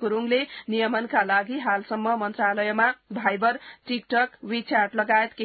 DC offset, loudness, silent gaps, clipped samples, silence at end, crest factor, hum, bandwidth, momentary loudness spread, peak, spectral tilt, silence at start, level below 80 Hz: under 0.1%; -24 LUFS; none; under 0.1%; 0 s; 18 dB; none; 4.8 kHz; 5 LU; -6 dBFS; -9 dB/octave; 0 s; -72 dBFS